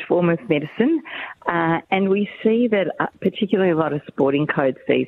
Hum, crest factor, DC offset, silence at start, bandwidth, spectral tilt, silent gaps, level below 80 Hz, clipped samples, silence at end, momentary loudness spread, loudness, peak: none; 18 dB; under 0.1%; 0 s; 4.2 kHz; -9.5 dB/octave; none; -62 dBFS; under 0.1%; 0 s; 5 LU; -20 LUFS; -2 dBFS